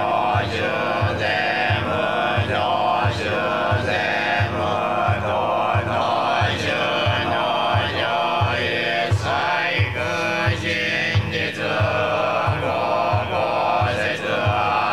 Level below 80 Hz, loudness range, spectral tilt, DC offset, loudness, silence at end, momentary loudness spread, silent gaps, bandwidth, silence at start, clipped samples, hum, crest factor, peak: -50 dBFS; 1 LU; -5.5 dB/octave; 0.3%; -20 LUFS; 0 s; 2 LU; none; 13 kHz; 0 s; under 0.1%; none; 14 dB; -6 dBFS